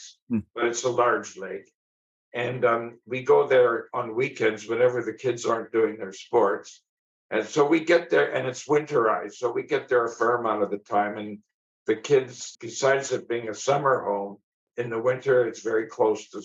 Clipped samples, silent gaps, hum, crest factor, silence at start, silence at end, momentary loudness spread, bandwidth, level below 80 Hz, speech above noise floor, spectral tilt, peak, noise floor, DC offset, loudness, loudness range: under 0.1%; 0.22-0.27 s, 1.74-2.32 s, 6.89-7.29 s, 11.54-11.86 s, 14.43-14.67 s; none; 16 dB; 0 s; 0 s; 13 LU; 8 kHz; -70 dBFS; over 65 dB; -4.5 dB/octave; -8 dBFS; under -90 dBFS; under 0.1%; -25 LUFS; 3 LU